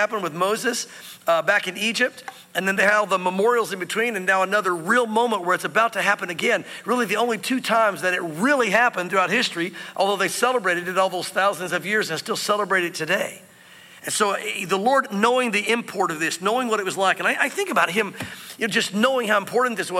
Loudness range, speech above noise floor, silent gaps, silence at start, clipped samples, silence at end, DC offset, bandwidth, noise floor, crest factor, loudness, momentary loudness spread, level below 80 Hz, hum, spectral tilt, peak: 2 LU; 25 dB; none; 0 s; under 0.1%; 0 s; under 0.1%; 16.5 kHz; -47 dBFS; 18 dB; -21 LUFS; 6 LU; -74 dBFS; none; -3 dB/octave; -4 dBFS